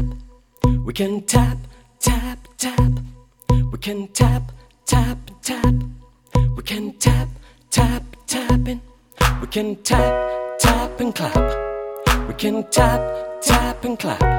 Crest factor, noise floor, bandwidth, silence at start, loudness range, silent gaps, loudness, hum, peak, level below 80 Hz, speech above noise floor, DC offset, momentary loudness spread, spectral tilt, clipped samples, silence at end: 18 dB; -39 dBFS; 17.5 kHz; 0 s; 2 LU; none; -20 LUFS; none; 0 dBFS; -26 dBFS; 20 dB; under 0.1%; 10 LU; -5 dB/octave; under 0.1%; 0 s